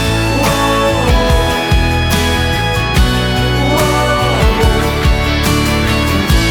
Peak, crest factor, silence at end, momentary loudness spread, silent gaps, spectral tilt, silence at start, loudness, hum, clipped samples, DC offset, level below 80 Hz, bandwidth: 0 dBFS; 12 dB; 0 s; 2 LU; none; -5 dB/octave; 0 s; -12 LUFS; none; under 0.1%; under 0.1%; -18 dBFS; over 20 kHz